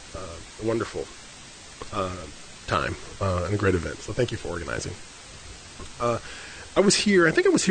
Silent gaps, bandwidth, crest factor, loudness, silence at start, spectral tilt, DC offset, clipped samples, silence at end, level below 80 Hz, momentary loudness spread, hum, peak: none; 9.4 kHz; 20 dB; -25 LUFS; 0 s; -4.5 dB/octave; under 0.1%; under 0.1%; 0 s; -46 dBFS; 22 LU; none; -6 dBFS